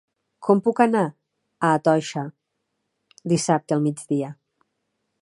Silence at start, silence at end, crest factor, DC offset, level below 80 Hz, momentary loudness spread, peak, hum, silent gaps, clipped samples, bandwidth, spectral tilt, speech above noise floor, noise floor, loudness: 0.4 s; 0.9 s; 20 dB; under 0.1%; -72 dBFS; 12 LU; -2 dBFS; none; none; under 0.1%; 11.5 kHz; -6 dB/octave; 56 dB; -77 dBFS; -22 LUFS